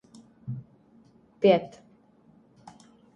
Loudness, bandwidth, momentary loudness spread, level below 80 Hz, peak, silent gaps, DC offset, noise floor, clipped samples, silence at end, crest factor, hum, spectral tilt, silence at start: -26 LUFS; 8.8 kHz; 22 LU; -70 dBFS; -6 dBFS; none; under 0.1%; -59 dBFS; under 0.1%; 1.5 s; 24 dB; none; -7.5 dB/octave; 0.45 s